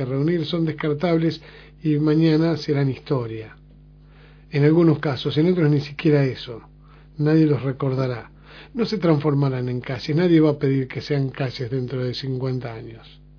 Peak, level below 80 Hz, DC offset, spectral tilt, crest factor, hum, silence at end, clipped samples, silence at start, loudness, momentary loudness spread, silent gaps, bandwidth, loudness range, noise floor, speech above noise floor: -4 dBFS; -50 dBFS; under 0.1%; -8.5 dB/octave; 18 dB; 50 Hz at -45 dBFS; 0.3 s; under 0.1%; 0 s; -21 LUFS; 13 LU; none; 5.4 kHz; 2 LU; -47 dBFS; 26 dB